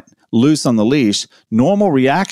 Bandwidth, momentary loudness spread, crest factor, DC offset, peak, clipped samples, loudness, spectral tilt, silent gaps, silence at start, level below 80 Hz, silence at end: 14 kHz; 7 LU; 12 dB; under 0.1%; -2 dBFS; under 0.1%; -14 LUFS; -5.5 dB/octave; none; 0.3 s; -52 dBFS; 0 s